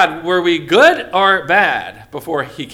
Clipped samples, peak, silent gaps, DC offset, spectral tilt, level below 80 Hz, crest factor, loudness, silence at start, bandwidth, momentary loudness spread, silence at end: under 0.1%; 0 dBFS; none; under 0.1%; -4 dB/octave; -52 dBFS; 14 dB; -13 LUFS; 0 s; 16 kHz; 12 LU; 0 s